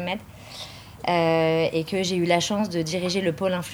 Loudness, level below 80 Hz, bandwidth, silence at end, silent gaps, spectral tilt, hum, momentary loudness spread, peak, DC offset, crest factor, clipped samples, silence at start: -24 LUFS; -56 dBFS; over 20 kHz; 0 s; none; -5 dB/octave; none; 16 LU; -6 dBFS; under 0.1%; 18 dB; under 0.1%; 0 s